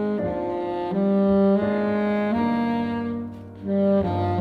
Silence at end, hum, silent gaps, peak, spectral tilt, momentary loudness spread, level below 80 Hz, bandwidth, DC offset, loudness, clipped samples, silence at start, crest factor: 0 s; none; none; -10 dBFS; -9.5 dB/octave; 9 LU; -50 dBFS; 4.9 kHz; under 0.1%; -23 LUFS; under 0.1%; 0 s; 12 dB